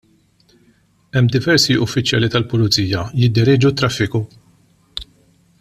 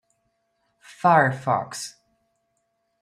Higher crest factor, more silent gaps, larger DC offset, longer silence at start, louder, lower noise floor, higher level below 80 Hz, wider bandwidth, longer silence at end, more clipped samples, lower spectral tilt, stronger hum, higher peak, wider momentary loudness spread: second, 16 dB vs 22 dB; neither; neither; about the same, 1.15 s vs 1.05 s; first, -16 LUFS vs -21 LUFS; second, -56 dBFS vs -73 dBFS; first, -46 dBFS vs -70 dBFS; about the same, 14 kHz vs 14.5 kHz; second, 0.55 s vs 1.1 s; neither; about the same, -5 dB/octave vs -5 dB/octave; neither; about the same, -2 dBFS vs -4 dBFS; about the same, 18 LU vs 16 LU